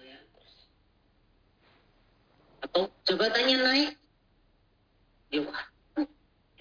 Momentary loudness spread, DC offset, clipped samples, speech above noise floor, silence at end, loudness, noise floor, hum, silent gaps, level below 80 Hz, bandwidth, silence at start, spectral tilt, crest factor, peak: 15 LU; under 0.1%; under 0.1%; 41 dB; 0.55 s; -28 LUFS; -67 dBFS; none; none; -68 dBFS; 5.4 kHz; 0.05 s; -3.5 dB/octave; 22 dB; -10 dBFS